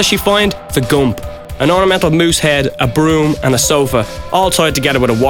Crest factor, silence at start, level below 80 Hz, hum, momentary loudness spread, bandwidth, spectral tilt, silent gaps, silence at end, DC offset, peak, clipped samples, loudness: 12 dB; 0 s; -30 dBFS; none; 6 LU; 19 kHz; -4 dB/octave; none; 0 s; under 0.1%; 0 dBFS; under 0.1%; -12 LUFS